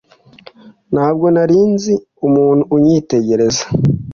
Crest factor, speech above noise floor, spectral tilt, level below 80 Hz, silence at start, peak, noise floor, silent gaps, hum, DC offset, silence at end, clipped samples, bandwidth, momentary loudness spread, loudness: 12 dB; 30 dB; -6.5 dB/octave; -44 dBFS; 0.65 s; -2 dBFS; -42 dBFS; none; none; under 0.1%; 0 s; under 0.1%; 7.4 kHz; 5 LU; -13 LUFS